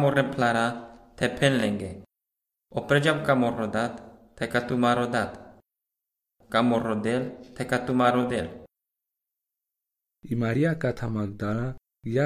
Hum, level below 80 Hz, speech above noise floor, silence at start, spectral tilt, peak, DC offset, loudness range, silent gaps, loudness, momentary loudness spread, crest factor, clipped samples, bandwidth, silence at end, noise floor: none; -54 dBFS; 61 dB; 0 s; -6 dB/octave; -6 dBFS; under 0.1%; 4 LU; none; -26 LUFS; 13 LU; 20 dB; under 0.1%; 14 kHz; 0 s; -86 dBFS